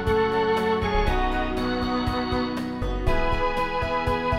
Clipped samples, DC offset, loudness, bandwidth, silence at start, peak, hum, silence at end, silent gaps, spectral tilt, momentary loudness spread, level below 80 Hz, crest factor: under 0.1%; 0.2%; -25 LUFS; 15 kHz; 0 s; -8 dBFS; none; 0 s; none; -6.5 dB/octave; 4 LU; -30 dBFS; 16 dB